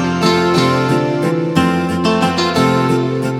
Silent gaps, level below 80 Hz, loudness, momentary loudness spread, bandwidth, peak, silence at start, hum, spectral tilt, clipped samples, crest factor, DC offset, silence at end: none; -46 dBFS; -14 LUFS; 3 LU; 15 kHz; 0 dBFS; 0 s; none; -6 dB/octave; under 0.1%; 14 dB; under 0.1%; 0 s